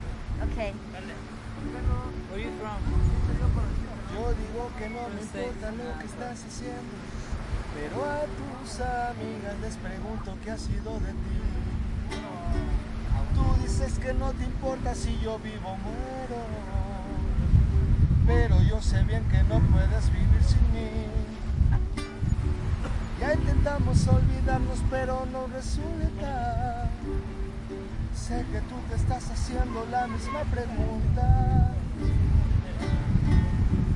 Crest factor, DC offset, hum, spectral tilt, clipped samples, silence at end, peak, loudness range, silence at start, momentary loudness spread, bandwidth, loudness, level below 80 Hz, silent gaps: 18 dB; under 0.1%; none; -7 dB/octave; under 0.1%; 0 s; -8 dBFS; 9 LU; 0 s; 13 LU; 11 kHz; -29 LUFS; -30 dBFS; none